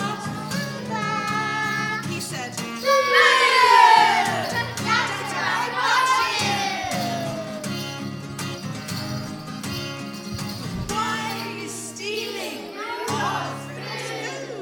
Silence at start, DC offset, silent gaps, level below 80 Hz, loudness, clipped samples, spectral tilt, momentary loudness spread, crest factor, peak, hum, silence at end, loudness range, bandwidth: 0 s; under 0.1%; none; -54 dBFS; -22 LUFS; under 0.1%; -3 dB/octave; 16 LU; 22 dB; -2 dBFS; none; 0 s; 12 LU; over 20 kHz